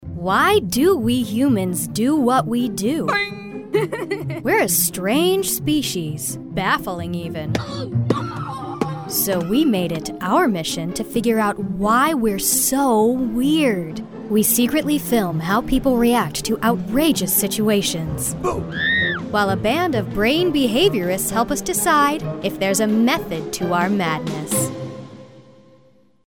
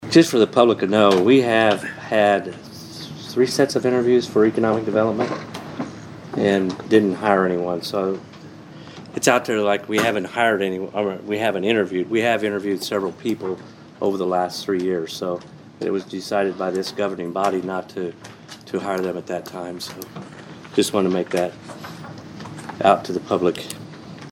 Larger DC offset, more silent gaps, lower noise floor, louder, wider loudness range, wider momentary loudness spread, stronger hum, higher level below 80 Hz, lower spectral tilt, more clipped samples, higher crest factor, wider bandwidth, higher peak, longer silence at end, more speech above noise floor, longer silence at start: first, 0.2% vs under 0.1%; neither; first, -55 dBFS vs -40 dBFS; about the same, -19 LUFS vs -20 LUFS; second, 4 LU vs 7 LU; second, 9 LU vs 19 LU; neither; first, -42 dBFS vs -64 dBFS; about the same, -4 dB/octave vs -5 dB/octave; neither; about the same, 16 dB vs 20 dB; about the same, 18 kHz vs 16.5 kHz; second, -4 dBFS vs 0 dBFS; first, 0.9 s vs 0 s; first, 36 dB vs 20 dB; about the same, 0 s vs 0 s